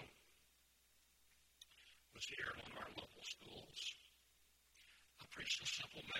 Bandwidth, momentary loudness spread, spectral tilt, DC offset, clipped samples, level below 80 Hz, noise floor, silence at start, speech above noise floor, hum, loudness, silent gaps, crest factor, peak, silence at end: 16.5 kHz; 24 LU; -1 dB/octave; under 0.1%; under 0.1%; -76 dBFS; -75 dBFS; 0 s; 28 dB; none; -48 LUFS; none; 24 dB; -30 dBFS; 0 s